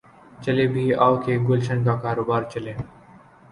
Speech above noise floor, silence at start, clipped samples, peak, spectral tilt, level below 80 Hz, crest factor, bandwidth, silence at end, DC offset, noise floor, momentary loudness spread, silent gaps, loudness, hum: 28 dB; 0.4 s; under 0.1%; -4 dBFS; -8 dB/octave; -54 dBFS; 20 dB; 11 kHz; 0.65 s; under 0.1%; -49 dBFS; 13 LU; none; -22 LUFS; none